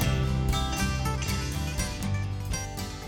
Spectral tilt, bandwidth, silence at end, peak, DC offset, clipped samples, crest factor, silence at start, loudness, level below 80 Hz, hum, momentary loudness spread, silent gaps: -4.5 dB/octave; 18 kHz; 0 s; -14 dBFS; under 0.1%; under 0.1%; 14 dB; 0 s; -30 LUFS; -34 dBFS; none; 5 LU; none